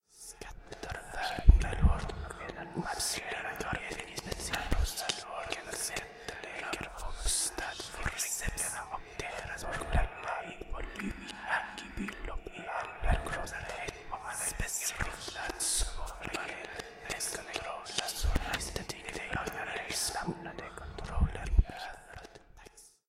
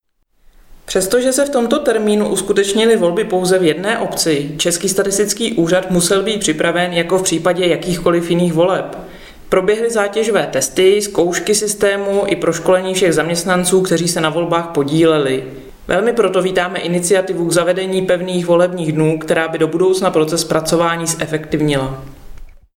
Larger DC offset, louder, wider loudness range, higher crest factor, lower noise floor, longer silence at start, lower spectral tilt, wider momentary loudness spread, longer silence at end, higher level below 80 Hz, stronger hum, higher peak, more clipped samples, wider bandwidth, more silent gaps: neither; second, -36 LUFS vs -15 LUFS; first, 5 LU vs 1 LU; first, 28 dB vs 14 dB; first, -56 dBFS vs -50 dBFS; second, 0.15 s vs 0.7 s; about the same, -3 dB/octave vs -4 dB/octave; first, 12 LU vs 4 LU; about the same, 0.2 s vs 0.25 s; first, -36 dBFS vs -42 dBFS; neither; second, -6 dBFS vs 0 dBFS; neither; about the same, 16 kHz vs 17 kHz; neither